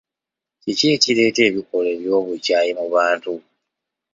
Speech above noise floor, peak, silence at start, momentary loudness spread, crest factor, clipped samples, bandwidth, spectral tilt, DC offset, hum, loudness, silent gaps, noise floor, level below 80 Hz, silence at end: 68 dB; 0 dBFS; 0.65 s; 10 LU; 20 dB; under 0.1%; 7.8 kHz; -3.5 dB/octave; under 0.1%; none; -18 LUFS; none; -86 dBFS; -64 dBFS; 0.75 s